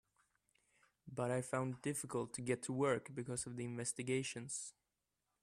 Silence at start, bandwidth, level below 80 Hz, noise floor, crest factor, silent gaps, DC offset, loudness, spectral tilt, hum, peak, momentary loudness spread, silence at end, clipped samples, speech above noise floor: 1.05 s; 14.5 kHz; -76 dBFS; -89 dBFS; 20 dB; none; under 0.1%; -42 LUFS; -4.5 dB/octave; none; -24 dBFS; 7 LU; 0.7 s; under 0.1%; 47 dB